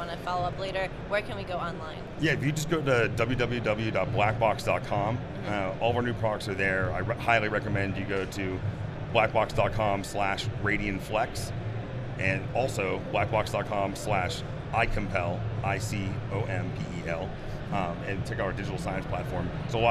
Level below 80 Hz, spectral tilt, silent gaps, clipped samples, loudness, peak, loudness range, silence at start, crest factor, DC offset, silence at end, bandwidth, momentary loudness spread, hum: -44 dBFS; -6 dB/octave; none; under 0.1%; -29 LUFS; -8 dBFS; 4 LU; 0 s; 22 dB; under 0.1%; 0 s; 13.5 kHz; 8 LU; none